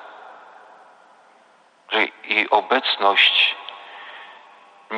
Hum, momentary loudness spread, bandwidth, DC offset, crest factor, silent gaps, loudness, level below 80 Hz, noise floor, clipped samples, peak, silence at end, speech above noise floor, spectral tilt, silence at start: none; 24 LU; 10 kHz; under 0.1%; 20 dB; none; -17 LUFS; -78 dBFS; -55 dBFS; under 0.1%; -2 dBFS; 0 s; 36 dB; -2 dB/octave; 0 s